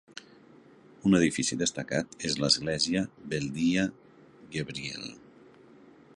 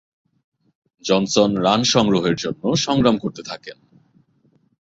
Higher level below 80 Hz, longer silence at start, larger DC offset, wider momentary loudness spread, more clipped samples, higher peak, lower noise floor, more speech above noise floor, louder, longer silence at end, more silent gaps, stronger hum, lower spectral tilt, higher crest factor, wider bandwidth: second, -60 dBFS vs -52 dBFS; second, 0.15 s vs 1.05 s; neither; about the same, 14 LU vs 16 LU; neither; second, -10 dBFS vs -2 dBFS; second, -55 dBFS vs -61 dBFS; second, 27 dB vs 42 dB; second, -29 LUFS vs -18 LUFS; second, 1 s vs 1.15 s; neither; neither; about the same, -4 dB/octave vs -4.5 dB/octave; about the same, 22 dB vs 20 dB; first, 11.5 kHz vs 8 kHz